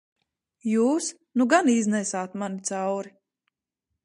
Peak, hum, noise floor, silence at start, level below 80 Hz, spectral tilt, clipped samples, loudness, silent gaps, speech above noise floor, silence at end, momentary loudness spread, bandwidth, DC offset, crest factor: -6 dBFS; none; -83 dBFS; 0.65 s; -78 dBFS; -4.5 dB/octave; under 0.1%; -25 LUFS; none; 59 dB; 0.95 s; 12 LU; 11.5 kHz; under 0.1%; 20 dB